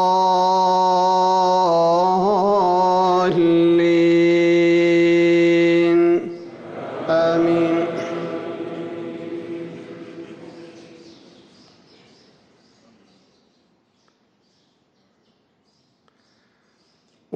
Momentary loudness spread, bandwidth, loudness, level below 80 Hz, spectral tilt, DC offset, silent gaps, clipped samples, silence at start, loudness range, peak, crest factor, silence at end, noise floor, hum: 18 LU; 7.6 kHz; -17 LUFS; -62 dBFS; -6.5 dB/octave; under 0.1%; none; under 0.1%; 0 s; 18 LU; -10 dBFS; 10 dB; 0 s; -63 dBFS; none